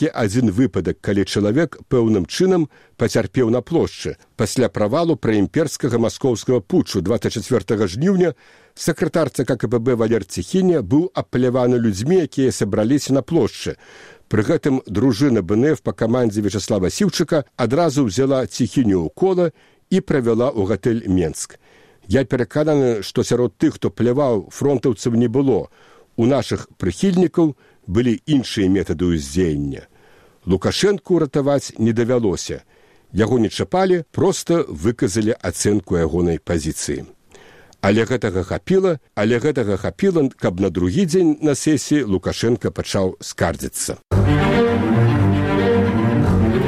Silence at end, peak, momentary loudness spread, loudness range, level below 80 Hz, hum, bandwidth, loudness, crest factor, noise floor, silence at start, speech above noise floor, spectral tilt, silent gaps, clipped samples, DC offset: 0 s; -2 dBFS; 6 LU; 2 LU; -40 dBFS; none; 15 kHz; -19 LUFS; 18 dB; -50 dBFS; 0 s; 32 dB; -6 dB/octave; none; under 0.1%; 0.2%